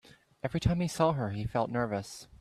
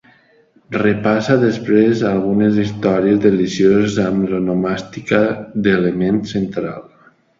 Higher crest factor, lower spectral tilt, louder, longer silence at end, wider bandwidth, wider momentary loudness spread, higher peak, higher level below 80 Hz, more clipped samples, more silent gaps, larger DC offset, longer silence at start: about the same, 20 dB vs 16 dB; about the same, -6.5 dB/octave vs -7 dB/octave; second, -32 LUFS vs -16 LUFS; second, 0.05 s vs 0.6 s; first, 14 kHz vs 7.6 kHz; about the same, 9 LU vs 8 LU; second, -12 dBFS vs 0 dBFS; about the same, -50 dBFS vs -48 dBFS; neither; neither; neither; second, 0.45 s vs 0.7 s